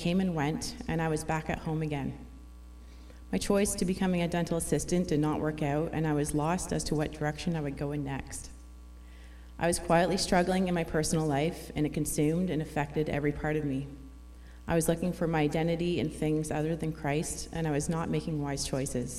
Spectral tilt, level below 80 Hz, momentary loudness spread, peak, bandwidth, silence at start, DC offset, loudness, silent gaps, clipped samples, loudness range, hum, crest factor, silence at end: -5.5 dB/octave; -46 dBFS; 21 LU; -12 dBFS; 15 kHz; 0 s; under 0.1%; -31 LUFS; none; under 0.1%; 4 LU; none; 18 dB; 0 s